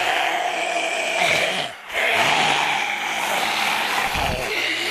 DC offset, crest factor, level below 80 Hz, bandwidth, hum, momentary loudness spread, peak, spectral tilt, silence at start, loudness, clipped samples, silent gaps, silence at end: under 0.1%; 16 dB; -44 dBFS; 15 kHz; none; 5 LU; -6 dBFS; -1.5 dB/octave; 0 s; -20 LUFS; under 0.1%; none; 0 s